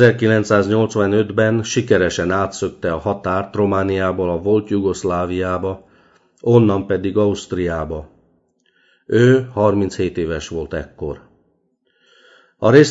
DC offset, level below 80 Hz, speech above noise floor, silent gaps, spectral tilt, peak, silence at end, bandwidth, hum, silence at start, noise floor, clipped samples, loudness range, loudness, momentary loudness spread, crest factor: under 0.1%; -44 dBFS; 48 dB; none; -6.5 dB/octave; 0 dBFS; 0 s; 8 kHz; none; 0 s; -64 dBFS; under 0.1%; 2 LU; -18 LUFS; 12 LU; 18 dB